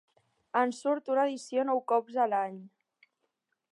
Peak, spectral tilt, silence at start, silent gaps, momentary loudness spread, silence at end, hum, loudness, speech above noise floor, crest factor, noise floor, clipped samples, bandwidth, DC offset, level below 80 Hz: -12 dBFS; -4.5 dB/octave; 0.55 s; none; 5 LU; 1.05 s; none; -30 LUFS; 51 dB; 18 dB; -81 dBFS; under 0.1%; 11.5 kHz; under 0.1%; under -90 dBFS